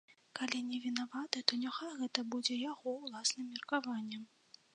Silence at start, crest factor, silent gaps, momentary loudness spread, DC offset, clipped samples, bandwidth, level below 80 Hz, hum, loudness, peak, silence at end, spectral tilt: 0.1 s; 30 dB; none; 8 LU; under 0.1%; under 0.1%; 10 kHz; under -90 dBFS; none; -38 LUFS; -10 dBFS; 0.5 s; -1.5 dB/octave